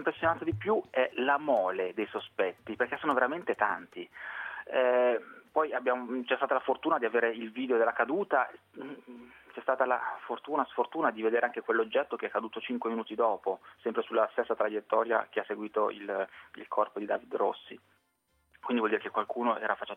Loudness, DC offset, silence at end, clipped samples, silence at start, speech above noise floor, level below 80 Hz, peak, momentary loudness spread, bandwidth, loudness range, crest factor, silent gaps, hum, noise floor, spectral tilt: -31 LUFS; under 0.1%; 0 s; under 0.1%; 0 s; 44 dB; -72 dBFS; -10 dBFS; 10 LU; 9.4 kHz; 3 LU; 20 dB; none; none; -74 dBFS; -7 dB/octave